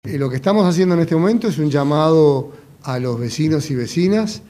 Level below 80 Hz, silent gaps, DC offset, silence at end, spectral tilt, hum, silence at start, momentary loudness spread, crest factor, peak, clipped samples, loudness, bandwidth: -54 dBFS; none; under 0.1%; 0.1 s; -7 dB/octave; none; 0.05 s; 9 LU; 16 dB; -2 dBFS; under 0.1%; -17 LUFS; 15 kHz